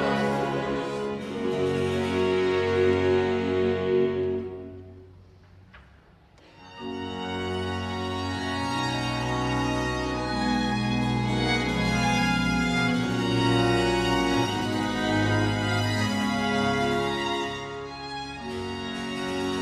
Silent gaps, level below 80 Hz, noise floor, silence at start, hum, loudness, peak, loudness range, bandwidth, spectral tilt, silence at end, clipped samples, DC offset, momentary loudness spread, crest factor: none; -44 dBFS; -55 dBFS; 0 s; none; -26 LUFS; -10 dBFS; 9 LU; 13.5 kHz; -5.5 dB/octave; 0 s; under 0.1%; under 0.1%; 10 LU; 16 dB